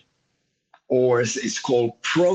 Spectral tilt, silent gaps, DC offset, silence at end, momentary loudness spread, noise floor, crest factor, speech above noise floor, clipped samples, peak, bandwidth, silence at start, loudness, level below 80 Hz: -4.5 dB/octave; none; under 0.1%; 0 s; 5 LU; -73 dBFS; 14 dB; 52 dB; under 0.1%; -8 dBFS; 8.6 kHz; 0.9 s; -22 LUFS; -68 dBFS